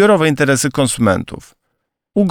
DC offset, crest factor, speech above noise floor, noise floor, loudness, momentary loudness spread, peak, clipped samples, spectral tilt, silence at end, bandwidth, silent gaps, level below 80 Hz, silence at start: under 0.1%; 14 dB; 58 dB; -72 dBFS; -15 LUFS; 14 LU; 0 dBFS; under 0.1%; -5 dB/octave; 0 s; 19 kHz; none; -46 dBFS; 0 s